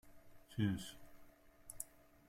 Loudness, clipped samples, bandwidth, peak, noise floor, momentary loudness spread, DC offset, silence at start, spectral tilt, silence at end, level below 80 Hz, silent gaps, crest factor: -44 LUFS; under 0.1%; 16.5 kHz; -24 dBFS; -63 dBFS; 22 LU; under 0.1%; 0.05 s; -5 dB/octave; 0.3 s; -68 dBFS; none; 22 dB